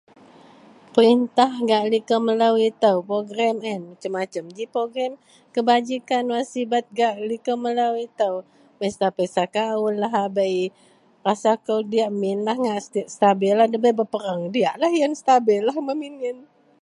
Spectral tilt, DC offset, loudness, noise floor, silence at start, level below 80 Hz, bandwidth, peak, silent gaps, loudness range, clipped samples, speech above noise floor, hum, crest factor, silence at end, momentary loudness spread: -5 dB/octave; under 0.1%; -22 LUFS; -49 dBFS; 0.95 s; -74 dBFS; 11 kHz; -2 dBFS; none; 4 LU; under 0.1%; 28 dB; none; 20 dB; 0.4 s; 11 LU